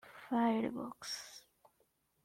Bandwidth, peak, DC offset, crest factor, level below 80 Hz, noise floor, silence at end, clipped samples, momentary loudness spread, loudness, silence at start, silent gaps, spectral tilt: 15.5 kHz; -24 dBFS; under 0.1%; 16 dB; -78 dBFS; -77 dBFS; 0.85 s; under 0.1%; 17 LU; -38 LUFS; 0.05 s; none; -4.5 dB/octave